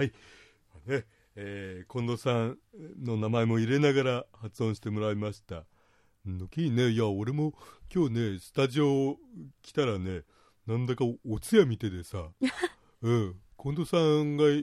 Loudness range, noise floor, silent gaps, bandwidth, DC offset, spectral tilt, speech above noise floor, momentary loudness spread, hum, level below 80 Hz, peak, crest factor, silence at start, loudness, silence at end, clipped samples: 3 LU; -66 dBFS; none; 13.5 kHz; under 0.1%; -7 dB/octave; 37 dB; 16 LU; none; -60 dBFS; -10 dBFS; 20 dB; 0 s; -30 LUFS; 0 s; under 0.1%